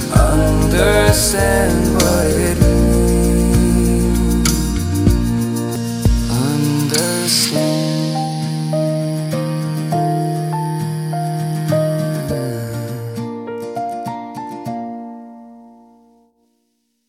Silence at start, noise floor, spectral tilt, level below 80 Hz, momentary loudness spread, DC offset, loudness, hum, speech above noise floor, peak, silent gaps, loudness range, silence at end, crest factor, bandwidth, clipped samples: 0 s; -66 dBFS; -5 dB/octave; -24 dBFS; 12 LU; under 0.1%; -17 LUFS; none; 53 dB; 0 dBFS; none; 13 LU; 1.45 s; 16 dB; 16.5 kHz; under 0.1%